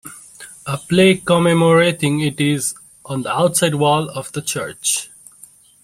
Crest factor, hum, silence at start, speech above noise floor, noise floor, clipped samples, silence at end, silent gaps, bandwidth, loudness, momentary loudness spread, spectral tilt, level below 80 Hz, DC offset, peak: 16 dB; none; 0.05 s; 30 dB; -46 dBFS; under 0.1%; 0.75 s; none; 16 kHz; -17 LUFS; 19 LU; -4.5 dB/octave; -54 dBFS; under 0.1%; -2 dBFS